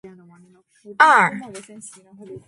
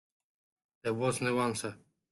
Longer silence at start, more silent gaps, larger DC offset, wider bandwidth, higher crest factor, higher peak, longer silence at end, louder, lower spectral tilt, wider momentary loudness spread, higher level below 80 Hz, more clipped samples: second, 0.05 s vs 0.85 s; neither; neither; about the same, 11.5 kHz vs 12.5 kHz; about the same, 22 dB vs 18 dB; first, 0 dBFS vs -18 dBFS; second, 0.1 s vs 0.35 s; first, -15 LUFS vs -33 LUFS; second, -3.5 dB/octave vs -5 dB/octave; first, 26 LU vs 9 LU; about the same, -70 dBFS vs -70 dBFS; neither